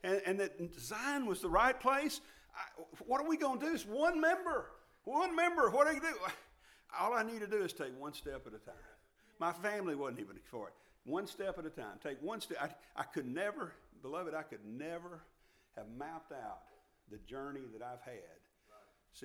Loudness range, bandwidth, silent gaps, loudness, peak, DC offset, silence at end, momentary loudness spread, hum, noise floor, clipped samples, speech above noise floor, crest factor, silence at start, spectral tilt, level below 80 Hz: 14 LU; 18 kHz; none; -38 LUFS; -16 dBFS; under 0.1%; 0 s; 20 LU; none; -67 dBFS; under 0.1%; 28 dB; 24 dB; 0.05 s; -4 dB/octave; -64 dBFS